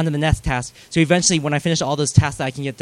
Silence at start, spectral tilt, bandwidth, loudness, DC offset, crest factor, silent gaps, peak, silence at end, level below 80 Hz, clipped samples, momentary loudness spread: 0 s; -4.5 dB/octave; 12.5 kHz; -19 LUFS; under 0.1%; 18 dB; none; 0 dBFS; 0 s; -34 dBFS; under 0.1%; 9 LU